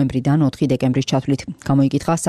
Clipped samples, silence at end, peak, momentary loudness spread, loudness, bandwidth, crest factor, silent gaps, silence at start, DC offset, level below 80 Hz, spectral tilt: under 0.1%; 0 s; -8 dBFS; 4 LU; -18 LUFS; 13 kHz; 10 dB; none; 0 s; under 0.1%; -46 dBFS; -6.5 dB/octave